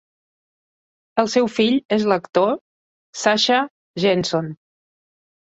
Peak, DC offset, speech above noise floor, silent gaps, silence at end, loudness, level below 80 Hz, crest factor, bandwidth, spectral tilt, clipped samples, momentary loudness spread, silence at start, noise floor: -2 dBFS; under 0.1%; over 71 dB; 1.85-1.89 s, 2.61-3.13 s, 3.70-3.94 s; 0.95 s; -20 LUFS; -62 dBFS; 20 dB; 8.2 kHz; -4.5 dB/octave; under 0.1%; 10 LU; 1.15 s; under -90 dBFS